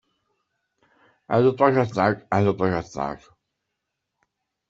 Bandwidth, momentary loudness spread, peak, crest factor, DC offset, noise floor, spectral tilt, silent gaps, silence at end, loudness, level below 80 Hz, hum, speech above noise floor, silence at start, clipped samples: 7.6 kHz; 12 LU; -4 dBFS; 22 dB; under 0.1%; -81 dBFS; -7.5 dB/octave; none; 1.55 s; -22 LUFS; -58 dBFS; none; 59 dB; 1.3 s; under 0.1%